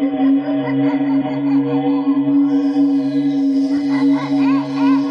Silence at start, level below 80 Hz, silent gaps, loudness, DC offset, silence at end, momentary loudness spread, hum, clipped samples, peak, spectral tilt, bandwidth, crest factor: 0 s; -66 dBFS; none; -16 LUFS; under 0.1%; 0 s; 2 LU; none; under 0.1%; -6 dBFS; -8 dB/octave; 6.2 kHz; 10 dB